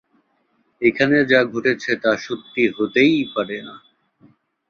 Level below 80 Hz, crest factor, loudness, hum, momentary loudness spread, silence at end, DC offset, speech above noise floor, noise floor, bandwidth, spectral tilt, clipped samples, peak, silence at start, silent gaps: -60 dBFS; 18 dB; -19 LUFS; none; 11 LU; 0.9 s; under 0.1%; 46 dB; -65 dBFS; 7.2 kHz; -5.5 dB/octave; under 0.1%; -2 dBFS; 0.8 s; none